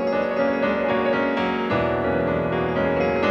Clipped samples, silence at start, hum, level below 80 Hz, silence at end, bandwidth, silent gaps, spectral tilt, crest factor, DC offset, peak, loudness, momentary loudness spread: under 0.1%; 0 s; none; -48 dBFS; 0 s; 6.6 kHz; none; -7.5 dB/octave; 12 dB; under 0.1%; -10 dBFS; -22 LUFS; 2 LU